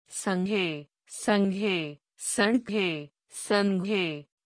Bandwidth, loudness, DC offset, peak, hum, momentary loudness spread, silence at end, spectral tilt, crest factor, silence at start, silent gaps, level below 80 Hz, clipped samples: 10.5 kHz; -28 LUFS; under 0.1%; -8 dBFS; none; 14 LU; 0.25 s; -4.5 dB/octave; 20 dB; 0.1 s; none; -70 dBFS; under 0.1%